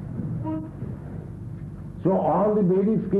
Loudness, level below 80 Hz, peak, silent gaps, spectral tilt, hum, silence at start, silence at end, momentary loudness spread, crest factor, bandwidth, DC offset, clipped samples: -24 LUFS; -46 dBFS; -10 dBFS; none; -11.5 dB/octave; none; 0 s; 0 s; 16 LU; 14 dB; 3.6 kHz; under 0.1%; under 0.1%